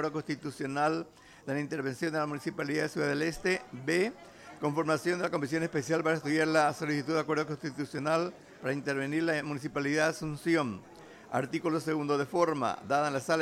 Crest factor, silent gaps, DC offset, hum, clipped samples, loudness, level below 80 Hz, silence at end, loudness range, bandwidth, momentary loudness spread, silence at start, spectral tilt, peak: 18 dB; none; under 0.1%; none; under 0.1%; -31 LUFS; -66 dBFS; 0 s; 2 LU; 15 kHz; 8 LU; 0 s; -5.5 dB/octave; -12 dBFS